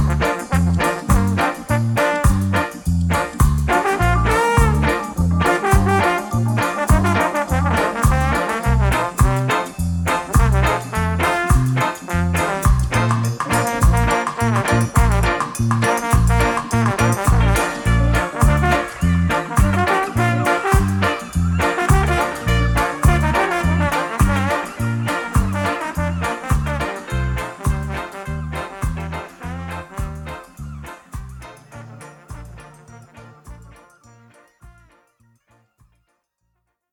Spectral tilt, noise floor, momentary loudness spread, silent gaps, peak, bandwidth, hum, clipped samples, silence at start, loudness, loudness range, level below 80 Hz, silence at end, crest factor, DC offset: -5.5 dB/octave; -71 dBFS; 12 LU; none; 0 dBFS; 20 kHz; none; under 0.1%; 0 s; -18 LUFS; 12 LU; -24 dBFS; 2.2 s; 18 dB; under 0.1%